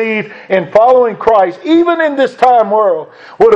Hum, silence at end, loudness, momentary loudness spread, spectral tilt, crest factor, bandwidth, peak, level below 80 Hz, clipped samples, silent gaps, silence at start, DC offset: none; 0 s; -11 LUFS; 7 LU; -6.5 dB/octave; 10 dB; 8.2 kHz; 0 dBFS; -50 dBFS; 0.5%; none; 0 s; under 0.1%